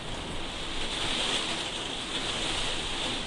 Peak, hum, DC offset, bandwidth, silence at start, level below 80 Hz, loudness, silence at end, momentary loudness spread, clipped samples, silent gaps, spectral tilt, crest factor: -16 dBFS; none; under 0.1%; 11.5 kHz; 0 s; -42 dBFS; -30 LUFS; 0 s; 8 LU; under 0.1%; none; -2 dB/octave; 16 dB